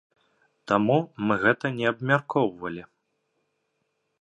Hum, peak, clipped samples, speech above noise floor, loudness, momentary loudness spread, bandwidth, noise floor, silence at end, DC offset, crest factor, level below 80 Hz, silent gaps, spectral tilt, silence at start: none; -6 dBFS; under 0.1%; 52 dB; -24 LUFS; 11 LU; 10 kHz; -76 dBFS; 1.35 s; under 0.1%; 22 dB; -66 dBFS; none; -7.5 dB/octave; 0.65 s